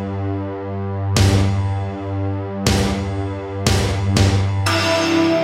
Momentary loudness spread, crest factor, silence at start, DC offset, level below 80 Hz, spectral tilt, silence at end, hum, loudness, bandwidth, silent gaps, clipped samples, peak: 9 LU; 18 dB; 0 s; under 0.1%; -32 dBFS; -5.5 dB/octave; 0 s; none; -19 LUFS; 15.5 kHz; none; under 0.1%; -2 dBFS